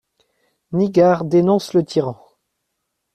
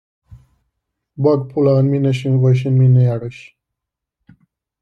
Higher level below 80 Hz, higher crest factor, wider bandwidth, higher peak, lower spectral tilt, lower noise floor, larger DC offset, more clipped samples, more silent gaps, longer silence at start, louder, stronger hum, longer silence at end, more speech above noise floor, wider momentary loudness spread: about the same, -58 dBFS vs -56 dBFS; about the same, 16 dB vs 14 dB; first, 12.5 kHz vs 6.2 kHz; about the same, -2 dBFS vs -2 dBFS; second, -7.5 dB/octave vs -9.5 dB/octave; second, -75 dBFS vs -81 dBFS; neither; neither; neither; second, 0.7 s vs 1.2 s; about the same, -17 LUFS vs -15 LUFS; neither; second, 1 s vs 1.4 s; second, 59 dB vs 67 dB; first, 9 LU vs 6 LU